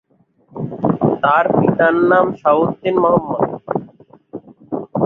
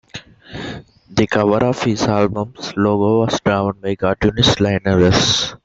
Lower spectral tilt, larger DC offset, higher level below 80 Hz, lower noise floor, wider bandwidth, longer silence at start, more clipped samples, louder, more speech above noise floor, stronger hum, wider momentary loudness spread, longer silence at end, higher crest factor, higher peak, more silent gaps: first, -10 dB/octave vs -5 dB/octave; neither; second, -52 dBFS vs -40 dBFS; first, -54 dBFS vs -37 dBFS; second, 4.3 kHz vs 8 kHz; first, 0.55 s vs 0.15 s; neither; about the same, -16 LUFS vs -16 LUFS; first, 40 dB vs 21 dB; neither; first, 21 LU vs 17 LU; about the same, 0 s vs 0.1 s; about the same, 16 dB vs 16 dB; about the same, -2 dBFS vs 0 dBFS; neither